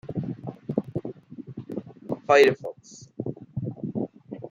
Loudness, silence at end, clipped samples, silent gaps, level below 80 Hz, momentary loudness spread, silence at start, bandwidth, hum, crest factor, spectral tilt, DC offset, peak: -26 LUFS; 0 s; under 0.1%; none; -62 dBFS; 23 LU; 0.05 s; 14.5 kHz; none; 24 dB; -6 dB/octave; under 0.1%; -4 dBFS